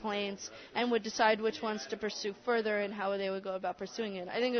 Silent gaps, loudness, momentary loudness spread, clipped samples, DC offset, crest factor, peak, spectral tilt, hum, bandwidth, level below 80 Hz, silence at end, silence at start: none; -34 LUFS; 9 LU; under 0.1%; under 0.1%; 18 dB; -16 dBFS; -2 dB/octave; none; 6.4 kHz; -74 dBFS; 0 s; 0 s